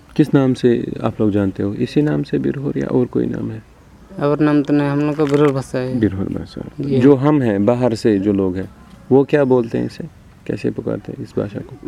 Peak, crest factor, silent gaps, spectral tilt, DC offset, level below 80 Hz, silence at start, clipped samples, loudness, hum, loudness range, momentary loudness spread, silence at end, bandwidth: 0 dBFS; 16 dB; none; -8.5 dB/octave; under 0.1%; -46 dBFS; 0.15 s; under 0.1%; -17 LUFS; none; 4 LU; 13 LU; 0.1 s; 11 kHz